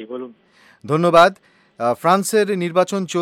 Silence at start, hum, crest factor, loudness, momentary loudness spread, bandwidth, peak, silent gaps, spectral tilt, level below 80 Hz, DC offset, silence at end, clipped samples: 0 s; none; 16 dB; -17 LUFS; 17 LU; 16.5 kHz; -2 dBFS; none; -5 dB/octave; -60 dBFS; under 0.1%; 0 s; under 0.1%